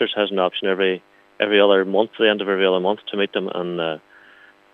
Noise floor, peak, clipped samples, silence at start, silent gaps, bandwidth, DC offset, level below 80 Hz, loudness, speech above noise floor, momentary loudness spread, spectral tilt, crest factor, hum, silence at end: -50 dBFS; -2 dBFS; under 0.1%; 0 s; none; 4.2 kHz; under 0.1%; -78 dBFS; -20 LUFS; 30 dB; 10 LU; -7 dB/octave; 18 dB; none; 0.75 s